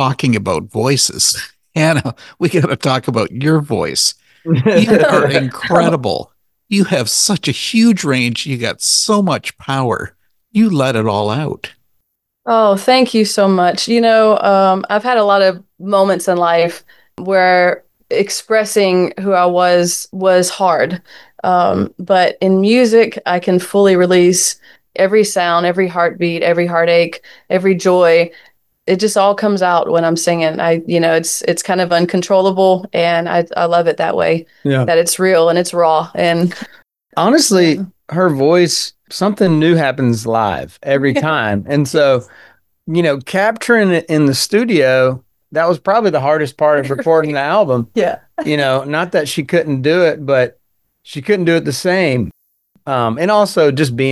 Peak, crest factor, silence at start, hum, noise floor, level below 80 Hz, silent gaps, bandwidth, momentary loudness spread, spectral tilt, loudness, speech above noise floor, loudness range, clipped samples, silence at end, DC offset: 0 dBFS; 14 dB; 0 s; none; -66 dBFS; -52 dBFS; none; 12.5 kHz; 8 LU; -4.5 dB/octave; -13 LUFS; 53 dB; 3 LU; under 0.1%; 0 s; under 0.1%